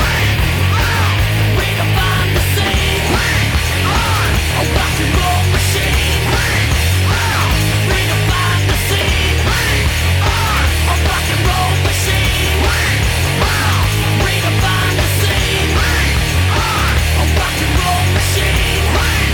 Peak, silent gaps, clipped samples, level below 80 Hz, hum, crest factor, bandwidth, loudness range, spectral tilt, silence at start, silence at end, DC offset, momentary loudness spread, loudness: 0 dBFS; none; under 0.1%; -20 dBFS; none; 12 dB; over 20 kHz; 0 LU; -4 dB/octave; 0 s; 0 s; under 0.1%; 1 LU; -14 LUFS